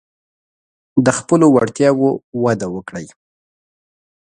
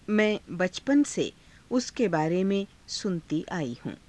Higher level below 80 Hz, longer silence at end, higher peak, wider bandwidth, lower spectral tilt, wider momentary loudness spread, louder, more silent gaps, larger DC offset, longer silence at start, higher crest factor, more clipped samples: about the same, -56 dBFS vs -60 dBFS; first, 1.25 s vs 0.1 s; first, 0 dBFS vs -12 dBFS; about the same, 10.5 kHz vs 11 kHz; about the same, -6 dB/octave vs -5 dB/octave; first, 15 LU vs 8 LU; first, -15 LUFS vs -28 LUFS; first, 2.23-2.32 s vs none; neither; first, 0.95 s vs 0.1 s; about the same, 18 dB vs 16 dB; neither